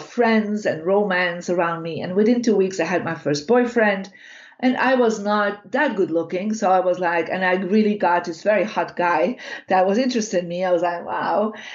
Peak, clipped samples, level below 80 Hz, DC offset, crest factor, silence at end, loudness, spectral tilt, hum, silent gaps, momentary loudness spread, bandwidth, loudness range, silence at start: -6 dBFS; under 0.1%; -70 dBFS; under 0.1%; 14 dB; 0 s; -20 LUFS; -4 dB/octave; none; none; 6 LU; 7.6 kHz; 1 LU; 0 s